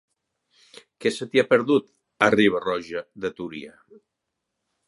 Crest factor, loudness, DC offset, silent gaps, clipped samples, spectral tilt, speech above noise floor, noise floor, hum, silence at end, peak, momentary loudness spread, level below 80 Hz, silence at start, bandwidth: 24 dB; -23 LUFS; under 0.1%; none; under 0.1%; -5 dB/octave; 59 dB; -81 dBFS; none; 1.2 s; 0 dBFS; 16 LU; -64 dBFS; 1 s; 11.5 kHz